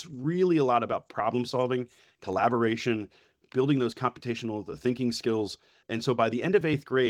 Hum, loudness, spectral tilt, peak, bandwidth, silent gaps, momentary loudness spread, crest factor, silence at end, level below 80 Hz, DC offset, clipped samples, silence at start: none; -28 LUFS; -6.5 dB/octave; -8 dBFS; 13 kHz; none; 10 LU; 20 dB; 0 s; -66 dBFS; under 0.1%; under 0.1%; 0 s